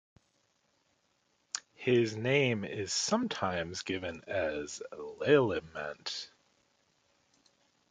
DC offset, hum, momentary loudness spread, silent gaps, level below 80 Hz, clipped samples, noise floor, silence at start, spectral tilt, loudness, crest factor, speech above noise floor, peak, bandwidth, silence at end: under 0.1%; none; 14 LU; none; -62 dBFS; under 0.1%; -75 dBFS; 1.55 s; -4 dB/octave; -32 LUFS; 22 dB; 43 dB; -12 dBFS; 9.6 kHz; 1.65 s